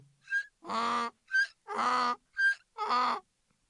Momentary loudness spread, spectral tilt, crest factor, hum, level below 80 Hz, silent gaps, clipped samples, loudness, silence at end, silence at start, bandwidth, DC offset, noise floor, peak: 6 LU; -1.5 dB/octave; 14 dB; none; -82 dBFS; none; under 0.1%; -31 LUFS; 0.5 s; 0.3 s; 11 kHz; under 0.1%; -65 dBFS; -18 dBFS